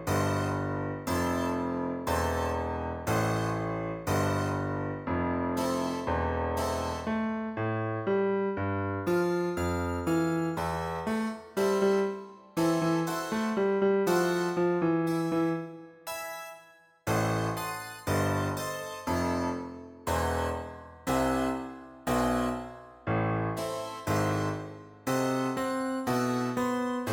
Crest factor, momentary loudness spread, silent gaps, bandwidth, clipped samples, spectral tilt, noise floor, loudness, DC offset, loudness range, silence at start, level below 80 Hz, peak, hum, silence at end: 16 dB; 9 LU; none; 19 kHz; under 0.1%; -6 dB/octave; -57 dBFS; -30 LUFS; under 0.1%; 4 LU; 0 s; -50 dBFS; -14 dBFS; none; 0 s